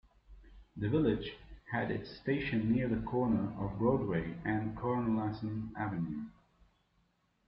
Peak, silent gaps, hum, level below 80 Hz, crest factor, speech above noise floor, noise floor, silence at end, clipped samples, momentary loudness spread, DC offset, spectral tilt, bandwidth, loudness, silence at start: -18 dBFS; none; none; -56 dBFS; 18 dB; 41 dB; -75 dBFS; 1.15 s; under 0.1%; 8 LU; under 0.1%; -10.5 dB/octave; 5.6 kHz; -35 LUFS; 0.3 s